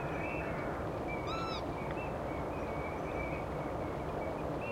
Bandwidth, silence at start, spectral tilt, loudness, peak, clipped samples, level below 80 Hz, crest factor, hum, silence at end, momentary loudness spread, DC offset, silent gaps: 16 kHz; 0 s; -7 dB/octave; -38 LUFS; -24 dBFS; under 0.1%; -50 dBFS; 14 dB; none; 0 s; 1 LU; under 0.1%; none